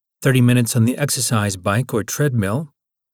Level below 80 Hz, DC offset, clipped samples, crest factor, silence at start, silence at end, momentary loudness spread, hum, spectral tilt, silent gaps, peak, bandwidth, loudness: -56 dBFS; under 0.1%; under 0.1%; 16 dB; 0.2 s; 0.45 s; 8 LU; none; -5 dB/octave; none; -4 dBFS; 18 kHz; -18 LUFS